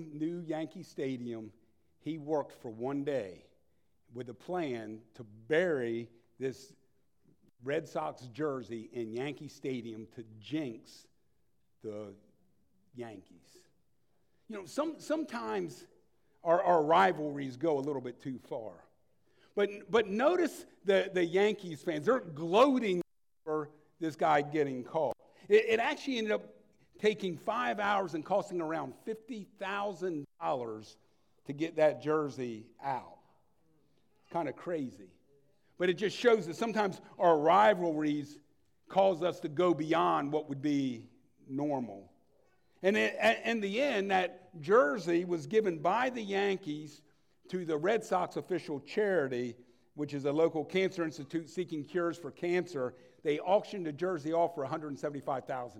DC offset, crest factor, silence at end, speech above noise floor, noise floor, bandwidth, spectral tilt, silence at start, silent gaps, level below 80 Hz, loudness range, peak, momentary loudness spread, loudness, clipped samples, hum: under 0.1%; 20 dB; 0 s; 46 dB; -78 dBFS; 15 kHz; -5.5 dB/octave; 0 s; none; -80 dBFS; 11 LU; -12 dBFS; 16 LU; -33 LUFS; under 0.1%; none